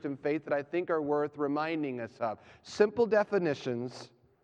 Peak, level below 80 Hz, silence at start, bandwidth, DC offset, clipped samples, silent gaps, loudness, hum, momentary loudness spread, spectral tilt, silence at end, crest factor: -12 dBFS; -74 dBFS; 0.05 s; 9 kHz; under 0.1%; under 0.1%; none; -31 LUFS; none; 11 LU; -6.5 dB/octave; 0.35 s; 20 dB